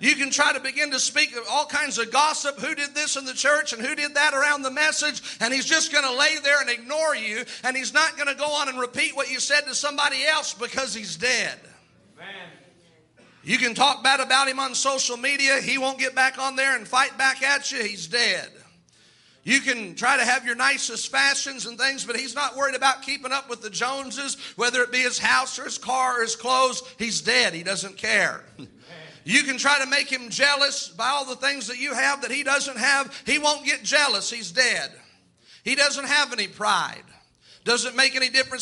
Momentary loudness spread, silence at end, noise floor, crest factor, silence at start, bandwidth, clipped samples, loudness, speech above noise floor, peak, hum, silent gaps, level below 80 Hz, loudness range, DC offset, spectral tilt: 8 LU; 0 s; -58 dBFS; 20 dB; 0 s; 11.5 kHz; under 0.1%; -22 LUFS; 34 dB; -4 dBFS; none; none; -70 dBFS; 3 LU; under 0.1%; -0.5 dB/octave